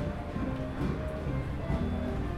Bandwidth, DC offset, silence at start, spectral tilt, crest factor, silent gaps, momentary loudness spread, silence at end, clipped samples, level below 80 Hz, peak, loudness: 12.5 kHz; under 0.1%; 0 s; -8.5 dB/octave; 14 dB; none; 3 LU; 0 s; under 0.1%; -38 dBFS; -18 dBFS; -34 LUFS